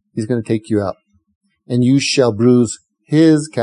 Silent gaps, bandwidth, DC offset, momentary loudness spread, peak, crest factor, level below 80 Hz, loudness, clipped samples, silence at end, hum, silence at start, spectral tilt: 1.35-1.41 s; 11 kHz; under 0.1%; 9 LU; 0 dBFS; 14 dB; -50 dBFS; -15 LUFS; under 0.1%; 0 s; none; 0.15 s; -6 dB/octave